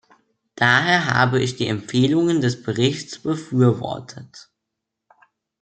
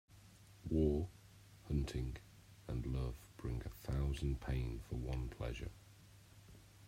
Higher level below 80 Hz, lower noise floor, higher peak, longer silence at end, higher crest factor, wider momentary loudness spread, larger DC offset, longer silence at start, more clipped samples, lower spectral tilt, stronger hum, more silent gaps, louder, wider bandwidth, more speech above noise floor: second, -60 dBFS vs -48 dBFS; first, -81 dBFS vs -62 dBFS; first, -2 dBFS vs -22 dBFS; first, 1.2 s vs 0 s; about the same, 20 dB vs 20 dB; second, 12 LU vs 24 LU; neither; first, 0.6 s vs 0.1 s; neither; second, -5.5 dB/octave vs -7.5 dB/octave; neither; neither; first, -19 LUFS vs -42 LUFS; second, 9 kHz vs 16 kHz; first, 62 dB vs 22 dB